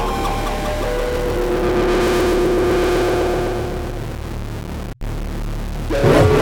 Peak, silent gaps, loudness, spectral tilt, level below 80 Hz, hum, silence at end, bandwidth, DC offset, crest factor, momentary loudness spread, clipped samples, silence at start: -2 dBFS; none; -19 LUFS; -6 dB/octave; -26 dBFS; none; 0 s; 19 kHz; under 0.1%; 16 dB; 12 LU; under 0.1%; 0 s